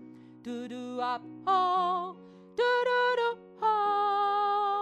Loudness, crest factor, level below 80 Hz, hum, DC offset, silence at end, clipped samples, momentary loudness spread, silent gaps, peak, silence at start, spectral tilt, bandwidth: -29 LUFS; 14 dB; -80 dBFS; none; under 0.1%; 0 s; under 0.1%; 14 LU; none; -16 dBFS; 0 s; -4 dB/octave; 10 kHz